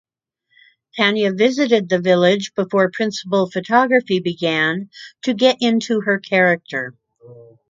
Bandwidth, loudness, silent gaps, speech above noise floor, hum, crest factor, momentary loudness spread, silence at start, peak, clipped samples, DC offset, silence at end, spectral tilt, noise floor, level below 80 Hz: 7.6 kHz; -17 LUFS; none; 50 dB; none; 18 dB; 11 LU; 0.95 s; 0 dBFS; under 0.1%; under 0.1%; 0.3 s; -5 dB/octave; -68 dBFS; -68 dBFS